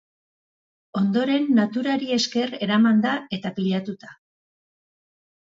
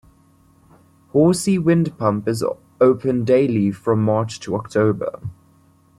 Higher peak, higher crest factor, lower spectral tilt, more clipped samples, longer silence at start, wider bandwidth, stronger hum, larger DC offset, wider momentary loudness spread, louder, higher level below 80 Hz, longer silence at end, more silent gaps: second, -8 dBFS vs -4 dBFS; about the same, 16 dB vs 16 dB; second, -5.5 dB/octave vs -7 dB/octave; neither; second, 0.95 s vs 1.15 s; second, 7.6 kHz vs 15 kHz; neither; neither; about the same, 11 LU vs 10 LU; second, -22 LUFS vs -19 LUFS; second, -68 dBFS vs -54 dBFS; first, 1.45 s vs 0.65 s; neither